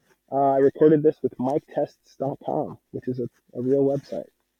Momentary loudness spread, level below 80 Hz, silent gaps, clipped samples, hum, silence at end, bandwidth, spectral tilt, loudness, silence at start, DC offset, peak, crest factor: 16 LU; -68 dBFS; none; under 0.1%; none; 0.35 s; 6.8 kHz; -9.5 dB/octave; -24 LUFS; 0.3 s; under 0.1%; -6 dBFS; 18 dB